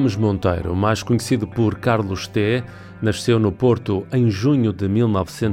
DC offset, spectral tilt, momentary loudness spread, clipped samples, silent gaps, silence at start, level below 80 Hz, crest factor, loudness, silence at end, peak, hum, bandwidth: under 0.1%; -7 dB/octave; 4 LU; under 0.1%; none; 0 s; -44 dBFS; 12 dB; -20 LUFS; 0 s; -6 dBFS; none; 15.5 kHz